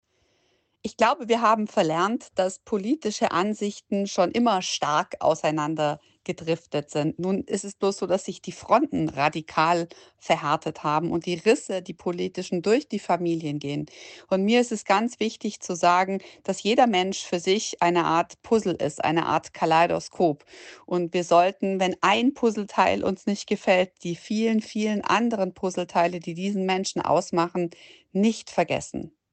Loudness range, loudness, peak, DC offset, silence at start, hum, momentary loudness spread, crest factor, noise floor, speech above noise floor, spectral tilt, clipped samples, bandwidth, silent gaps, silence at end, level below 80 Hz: 3 LU; -25 LUFS; -6 dBFS; under 0.1%; 0.85 s; none; 9 LU; 18 dB; -69 dBFS; 44 dB; -4.5 dB/octave; under 0.1%; 9 kHz; none; 0.25 s; -64 dBFS